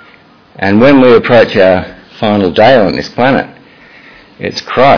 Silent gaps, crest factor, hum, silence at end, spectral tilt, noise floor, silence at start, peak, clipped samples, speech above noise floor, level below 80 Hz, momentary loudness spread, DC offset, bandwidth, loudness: none; 10 dB; none; 0 s; -7 dB/octave; -41 dBFS; 0.6 s; 0 dBFS; 2%; 34 dB; -42 dBFS; 14 LU; under 0.1%; 5.4 kHz; -8 LUFS